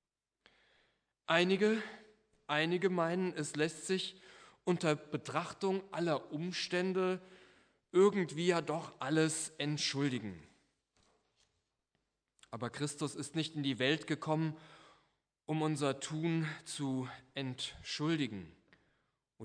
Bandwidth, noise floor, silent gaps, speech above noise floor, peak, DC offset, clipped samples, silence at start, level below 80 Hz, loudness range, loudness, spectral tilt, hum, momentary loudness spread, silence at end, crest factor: 11 kHz; -84 dBFS; none; 49 dB; -14 dBFS; under 0.1%; under 0.1%; 1.3 s; -76 dBFS; 6 LU; -36 LUFS; -5 dB/octave; none; 12 LU; 0 s; 24 dB